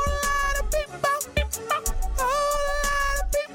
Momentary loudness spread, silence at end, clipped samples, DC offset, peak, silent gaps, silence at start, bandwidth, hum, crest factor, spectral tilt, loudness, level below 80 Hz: 3 LU; 0 s; under 0.1%; under 0.1%; -12 dBFS; none; 0 s; 17.5 kHz; none; 14 dB; -2.5 dB/octave; -25 LUFS; -30 dBFS